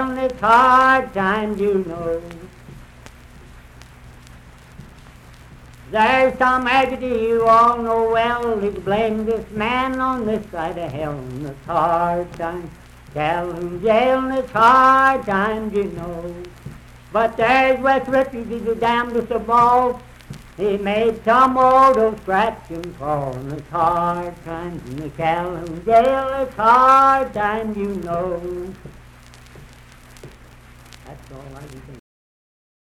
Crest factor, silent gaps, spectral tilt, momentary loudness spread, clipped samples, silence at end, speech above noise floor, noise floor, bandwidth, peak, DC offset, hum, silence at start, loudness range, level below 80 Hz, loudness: 16 dB; none; -6 dB/octave; 18 LU; under 0.1%; 0.9 s; 26 dB; -44 dBFS; 14.5 kHz; -2 dBFS; under 0.1%; none; 0 s; 8 LU; -44 dBFS; -18 LUFS